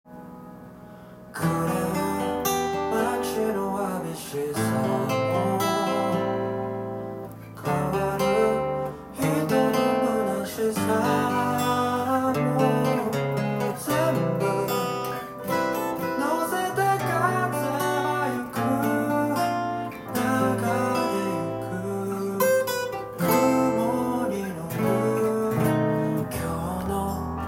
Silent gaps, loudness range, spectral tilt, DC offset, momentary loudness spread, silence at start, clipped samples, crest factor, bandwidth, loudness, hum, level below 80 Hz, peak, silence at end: none; 3 LU; -5.5 dB/octave; under 0.1%; 8 LU; 0.05 s; under 0.1%; 16 dB; 16.5 kHz; -25 LUFS; none; -54 dBFS; -8 dBFS; 0 s